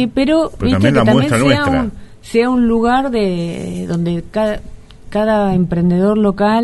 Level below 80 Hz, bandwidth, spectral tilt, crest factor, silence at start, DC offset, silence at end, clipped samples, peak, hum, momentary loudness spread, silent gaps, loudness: -34 dBFS; 11.5 kHz; -7 dB/octave; 14 dB; 0 s; under 0.1%; 0 s; under 0.1%; 0 dBFS; none; 9 LU; none; -15 LUFS